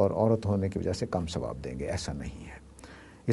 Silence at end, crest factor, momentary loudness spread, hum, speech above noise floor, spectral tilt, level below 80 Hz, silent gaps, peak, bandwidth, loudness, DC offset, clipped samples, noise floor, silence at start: 0 s; 18 dB; 22 LU; none; 19 dB; -6.5 dB/octave; -48 dBFS; none; -12 dBFS; 11.5 kHz; -31 LUFS; under 0.1%; under 0.1%; -50 dBFS; 0 s